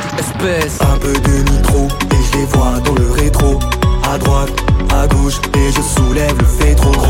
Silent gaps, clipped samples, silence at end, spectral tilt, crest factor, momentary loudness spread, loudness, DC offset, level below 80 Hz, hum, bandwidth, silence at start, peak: none; under 0.1%; 0 s; -5.5 dB/octave; 10 dB; 2 LU; -13 LUFS; under 0.1%; -14 dBFS; none; 17 kHz; 0 s; 0 dBFS